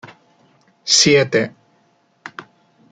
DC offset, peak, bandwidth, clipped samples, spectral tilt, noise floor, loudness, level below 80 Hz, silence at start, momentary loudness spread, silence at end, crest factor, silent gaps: under 0.1%; -2 dBFS; 11 kHz; under 0.1%; -2.5 dB/octave; -59 dBFS; -14 LUFS; -60 dBFS; 0.85 s; 25 LU; 0.5 s; 20 dB; none